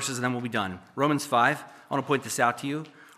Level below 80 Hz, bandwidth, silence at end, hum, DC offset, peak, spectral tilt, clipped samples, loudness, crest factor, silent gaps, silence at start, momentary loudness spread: -74 dBFS; 15 kHz; 0.15 s; none; under 0.1%; -6 dBFS; -4 dB/octave; under 0.1%; -27 LUFS; 22 dB; none; 0 s; 10 LU